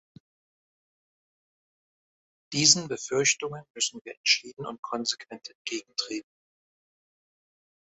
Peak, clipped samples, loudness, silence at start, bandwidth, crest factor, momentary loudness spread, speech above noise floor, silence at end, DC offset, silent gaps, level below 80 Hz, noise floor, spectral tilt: -2 dBFS; under 0.1%; -26 LUFS; 2.5 s; 8.6 kHz; 30 dB; 18 LU; over 61 dB; 1.65 s; under 0.1%; 3.70-3.74 s, 4.01-4.05 s, 4.17-4.24 s, 4.79-4.83 s, 5.55-5.65 s; -72 dBFS; under -90 dBFS; -1.5 dB/octave